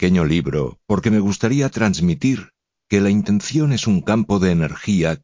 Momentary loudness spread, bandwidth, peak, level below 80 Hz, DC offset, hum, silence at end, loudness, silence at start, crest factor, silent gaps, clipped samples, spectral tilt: 4 LU; 7.6 kHz; -2 dBFS; -38 dBFS; under 0.1%; none; 0.05 s; -18 LUFS; 0 s; 16 dB; none; under 0.1%; -6.5 dB/octave